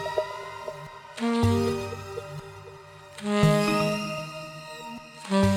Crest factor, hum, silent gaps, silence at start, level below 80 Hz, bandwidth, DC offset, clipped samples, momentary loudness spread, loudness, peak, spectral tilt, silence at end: 20 dB; none; none; 0 s; -50 dBFS; 16.5 kHz; under 0.1%; under 0.1%; 19 LU; -27 LUFS; -8 dBFS; -6 dB/octave; 0 s